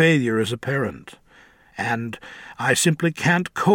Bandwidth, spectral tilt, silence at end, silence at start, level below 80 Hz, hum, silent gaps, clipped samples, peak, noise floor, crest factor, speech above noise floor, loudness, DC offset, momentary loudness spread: 17 kHz; -4.5 dB/octave; 0 s; 0 s; -60 dBFS; none; none; under 0.1%; -4 dBFS; -52 dBFS; 18 dB; 31 dB; -22 LUFS; under 0.1%; 19 LU